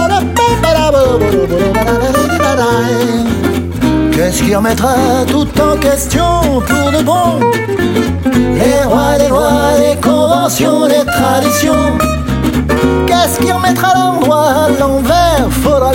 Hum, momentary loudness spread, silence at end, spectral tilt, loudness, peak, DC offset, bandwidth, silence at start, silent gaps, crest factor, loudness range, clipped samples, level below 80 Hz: none; 3 LU; 0 s; -5 dB/octave; -11 LUFS; 0 dBFS; under 0.1%; 16.5 kHz; 0 s; none; 10 dB; 2 LU; under 0.1%; -24 dBFS